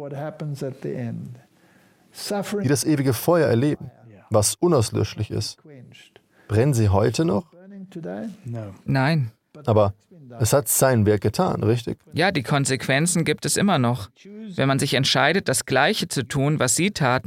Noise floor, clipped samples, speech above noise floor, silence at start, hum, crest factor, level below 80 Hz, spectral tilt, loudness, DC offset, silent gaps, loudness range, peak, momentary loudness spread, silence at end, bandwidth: -57 dBFS; under 0.1%; 35 dB; 0 s; none; 18 dB; -54 dBFS; -4.5 dB/octave; -21 LUFS; under 0.1%; none; 4 LU; -4 dBFS; 14 LU; 0.05 s; 17 kHz